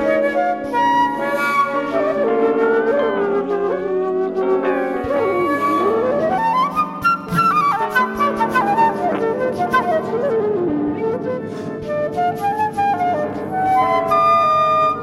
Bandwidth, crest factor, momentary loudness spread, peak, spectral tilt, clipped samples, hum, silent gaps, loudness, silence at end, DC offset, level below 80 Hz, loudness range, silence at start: 16 kHz; 14 dB; 6 LU; -4 dBFS; -6 dB/octave; under 0.1%; none; none; -18 LUFS; 0 s; under 0.1%; -52 dBFS; 3 LU; 0 s